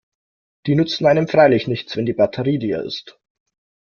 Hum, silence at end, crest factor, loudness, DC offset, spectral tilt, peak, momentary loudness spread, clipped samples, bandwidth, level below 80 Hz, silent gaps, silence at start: none; 0.75 s; 18 dB; -18 LUFS; under 0.1%; -7 dB/octave; 0 dBFS; 13 LU; under 0.1%; 7 kHz; -56 dBFS; none; 0.65 s